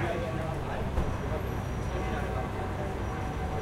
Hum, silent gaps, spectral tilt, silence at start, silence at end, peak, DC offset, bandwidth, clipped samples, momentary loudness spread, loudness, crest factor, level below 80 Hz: none; none; -7 dB/octave; 0 s; 0 s; -16 dBFS; under 0.1%; 15.5 kHz; under 0.1%; 2 LU; -33 LUFS; 16 dB; -38 dBFS